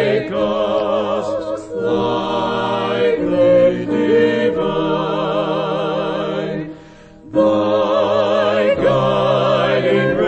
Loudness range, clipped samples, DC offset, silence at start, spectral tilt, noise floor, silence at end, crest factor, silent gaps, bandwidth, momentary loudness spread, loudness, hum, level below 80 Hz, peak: 3 LU; under 0.1%; under 0.1%; 0 s; -7 dB/octave; -40 dBFS; 0 s; 12 dB; none; 8.4 kHz; 7 LU; -17 LUFS; none; -48 dBFS; -4 dBFS